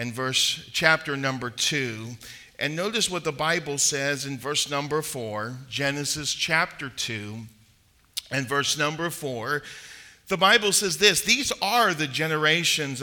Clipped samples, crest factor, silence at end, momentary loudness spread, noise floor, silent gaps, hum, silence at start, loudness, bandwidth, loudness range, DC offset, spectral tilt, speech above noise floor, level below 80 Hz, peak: under 0.1%; 24 dB; 0 s; 14 LU; -60 dBFS; none; none; 0 s; -24 LUFS; 19 kHz; 7 LU; under 0.1%; -2 dB/octave; 35 dB; -60 dBFS; -2 dBFS